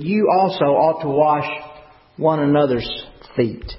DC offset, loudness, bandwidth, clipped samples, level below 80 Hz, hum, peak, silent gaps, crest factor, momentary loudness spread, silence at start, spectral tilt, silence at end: under 0.1%; -18 LUFS; 5.8 kHz; under 0.1%; -44 dBFS; none; -4 dBFS; none; 16 dB; 12 LU; 0 s; -11.5 dB/octave; 0 s